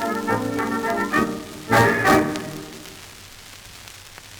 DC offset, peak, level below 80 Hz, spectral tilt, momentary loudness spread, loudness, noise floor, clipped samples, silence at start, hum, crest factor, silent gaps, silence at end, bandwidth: under 0.1%; -4 dBFS; -48 dBFS; -5 dB/octave; 23 LU; -20 LUFS; -42 dBFS; under 0.1%; 0 s; none; 20 dB; none; 0 s; over 20 kHz